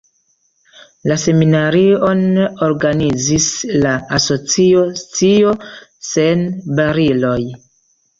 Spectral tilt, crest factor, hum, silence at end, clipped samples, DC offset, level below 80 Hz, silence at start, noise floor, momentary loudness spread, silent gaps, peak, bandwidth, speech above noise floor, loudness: -5 dB/octave; 12 dB; none; 0.65 s; under 0.1%; under 0.1%; -44 dBFS; 1.05 s; -61 dBFS; 8 LU; none; -2 dBFS; 7.6 kHz; 47 dB; -14 LUFS